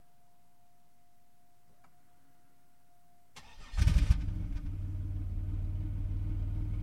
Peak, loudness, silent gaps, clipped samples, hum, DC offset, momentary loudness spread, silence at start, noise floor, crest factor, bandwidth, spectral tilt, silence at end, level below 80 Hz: -12 dBFS; -35 LUFS; none; under 0.1%; none; 0.2%; 19 LU; 3.35 s; -70 dBFS; 22 dB; 11.5 kHz; -6.5 dB/octave; 0 s; -38 dBFS